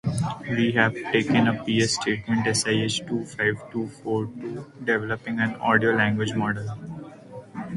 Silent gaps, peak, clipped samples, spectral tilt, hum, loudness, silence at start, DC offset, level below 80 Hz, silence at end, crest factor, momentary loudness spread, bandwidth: none; -4 dBFS; under 0.1%; -4.5 dB/octave; none; -24 LUFS; 0.05 s; under 0.1%; -56 dBFS; 0 s; 20 dB; 14 LU; 11.5 kHz